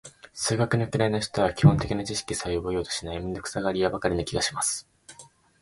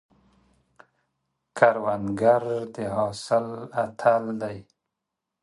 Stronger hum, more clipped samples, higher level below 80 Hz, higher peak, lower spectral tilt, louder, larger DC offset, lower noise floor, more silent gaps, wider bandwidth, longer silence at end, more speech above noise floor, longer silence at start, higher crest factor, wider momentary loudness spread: neither; neither; first, -46 dBFS vs -62 dBFS; about the same, -4 dBFS vs -2 dBFS; about the same, -5 dB/octave vs -6 dB/octave; about the same, -26 LUFS vs -25 LUFS; neither; second, -52 dBFS vs -84 dBFS; neither; about the same, 11.5 kHz vs 11.5 kHz; second, 0.35 s vs 0.8 s; second, 27 dB vs 61 dB; second, 0.05 s vs 1.55 s; about the same, 22 dB vs 24 dB; about the same, 11 LU vs 11 LU